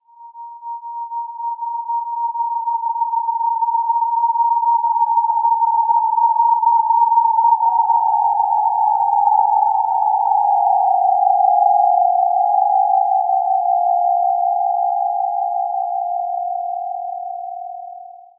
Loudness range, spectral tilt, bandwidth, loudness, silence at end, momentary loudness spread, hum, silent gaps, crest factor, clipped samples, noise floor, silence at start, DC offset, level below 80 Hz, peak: 6 LU; -4.5 dB/octave; 1 kHz; -17 LUFS; 0.2 s; 13 LU; none; none; 14 dB; under 0.1%; -37 dBFS; 0.2 s; under 0.1%; under -90 dBFS; -2 dBFS